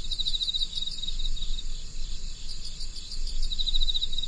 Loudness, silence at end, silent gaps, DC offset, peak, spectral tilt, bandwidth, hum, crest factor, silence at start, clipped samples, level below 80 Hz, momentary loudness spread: -31 LUFS; 0 s; none; under 0.1%; -10 dBFS; -1.5 dB/octave; 9.8 kHz; none; 16 dB; 0 s; under 0.1%; -30 dBFS; 13 LU